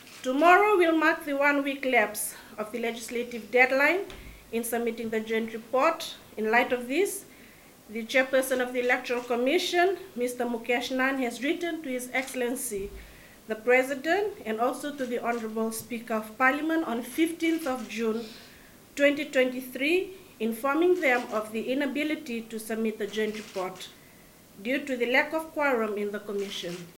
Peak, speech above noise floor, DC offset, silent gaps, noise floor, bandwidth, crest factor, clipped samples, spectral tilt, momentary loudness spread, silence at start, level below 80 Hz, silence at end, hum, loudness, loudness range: -6 dBFS; 26 dB; under 0.1%; none; -53 dBFS; 17 kHz; 22 dB; under 0.1%; -3 dB/octave; 12 LU; 0 s; -62 dBFS; 0.05 s; none; -27 LUFS; 4 LU